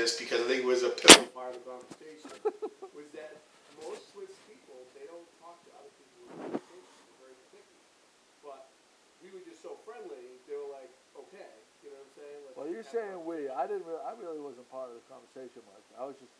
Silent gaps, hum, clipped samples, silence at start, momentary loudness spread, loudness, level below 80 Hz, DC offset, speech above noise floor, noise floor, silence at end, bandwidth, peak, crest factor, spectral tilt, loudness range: none; none; under 0.1%; 0 s; 22 LU; -24 LUFS; -70 dBFS; under 0.1%; 34 dB; -64 dBFS; 0.25 s; 11 kHz; 0 dBFS; 32 dB; -0.5 dB/octave; 26 LU